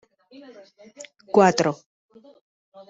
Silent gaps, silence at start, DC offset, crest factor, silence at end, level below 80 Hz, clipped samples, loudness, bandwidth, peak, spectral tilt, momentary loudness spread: none; 1 s; under 0.1%; 22 dB; 1.15 s; -66 dBFS; under 0.1%; -20 LUFS; 8 kHz; -2 dBFS; -5 dB/octave; 26 LU